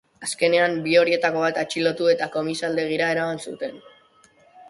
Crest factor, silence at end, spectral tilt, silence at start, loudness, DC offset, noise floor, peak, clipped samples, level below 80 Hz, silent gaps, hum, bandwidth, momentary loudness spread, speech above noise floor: 18 dB; 0.05 s; -4 dB/octave; 0.2 s; -22 LUFS; under 0.1%; -56 dBFS; -6 dBFS; under 0.1%; -66 dBFS; none; none; 11.5 kHz; 12 LU; 34 dB